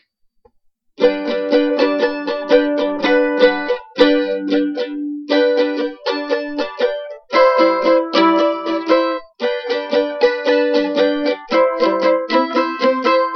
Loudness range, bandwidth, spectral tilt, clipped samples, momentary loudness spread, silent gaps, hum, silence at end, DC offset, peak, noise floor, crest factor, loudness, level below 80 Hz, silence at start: 2 LU; 6.4 kHz; -5 dB/octave; under 0.1%; 8 LU; none; none; 0 s; under 0.1%; 0 dBFS; -60 dBFS; 16 dB; -16 LUFS; -56 dBFS; 1 s